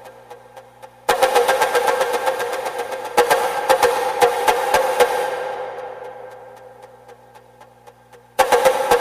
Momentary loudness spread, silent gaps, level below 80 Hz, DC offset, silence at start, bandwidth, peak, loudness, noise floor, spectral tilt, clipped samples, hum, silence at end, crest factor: 16 LU; none; -54 dBFS; under 0.1%; 0 s; 15.5 kHz; -2 dBFS; -18 LUFS; -47 dBFS; -1.5 dB/octave; under 0.1%; 60 Hz at -55 dBFS; 0 s; 18 dB